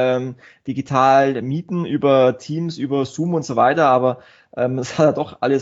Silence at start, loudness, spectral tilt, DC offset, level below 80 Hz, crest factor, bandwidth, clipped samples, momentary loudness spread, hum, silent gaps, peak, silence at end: 0 s; -18 LUFS; -5.5 dB/octave; under 0.1%; -62 dBFS; 16 dB; 8 kHz; under 0.1%; 13 LU; none; none; -2 dBFS; 0 s